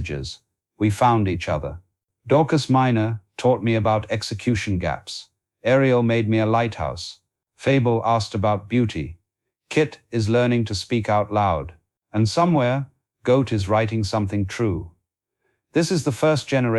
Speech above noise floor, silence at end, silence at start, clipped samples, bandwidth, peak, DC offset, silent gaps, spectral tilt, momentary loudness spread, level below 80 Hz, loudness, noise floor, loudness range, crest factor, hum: 57 dB; 0 s; 0 s; under 0.1%; 12 kHz; -6 dBFS; under 0.1%; none; -6.5 dB/octave; 11 LU; -46 dBFS; -21 LUFS; -77 dBFS; 2 LU; 16 dB; none